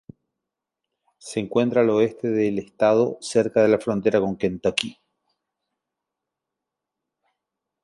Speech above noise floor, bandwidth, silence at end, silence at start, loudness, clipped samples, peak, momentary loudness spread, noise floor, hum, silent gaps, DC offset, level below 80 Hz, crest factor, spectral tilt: 64 dB; 11.5 kHz; 2.9 s; 1.25 s; -22 LUFS; under 0.1%; -2 dBFS; 7 LU; -85 dBFS; none; none; under 0.1%; -60 dBFS; 22 dB; -5.5 dB/octave